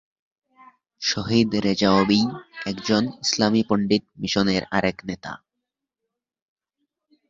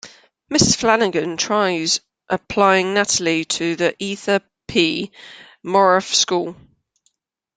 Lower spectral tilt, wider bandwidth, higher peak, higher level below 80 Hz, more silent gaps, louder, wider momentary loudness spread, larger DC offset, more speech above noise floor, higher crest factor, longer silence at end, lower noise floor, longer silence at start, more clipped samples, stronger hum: first, -4.5 dB/octave vs -3 dB/octave; second, 7.8 kHz vs 10 kHz; about the same, -4 dBFS vs -2 dBFS; about the same, -54 dBFS vs -52 dBFS; neither; second, -22 LUFS vs -18 LUFS; first, 14 LU vs 11 LU; neither; first, 62 dB vs 49 dB; about the same, 20 dB vs 18 dB; first, 1.95 s vs 1.05 s; first, -84 dBFS vs -67 dBFS; first, 1 s vs 0.05 s; neither; neither